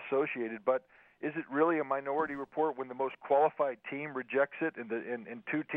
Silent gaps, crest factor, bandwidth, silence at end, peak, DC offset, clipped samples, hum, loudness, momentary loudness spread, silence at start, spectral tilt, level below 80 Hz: none; 18 dB; 3.9 kHz; 0 s; -14 dBFS; under 0.1%; under 0.1%; none; -33 LUFS; 10 LU; 0 s; -9 dB/octave; -80 dBFS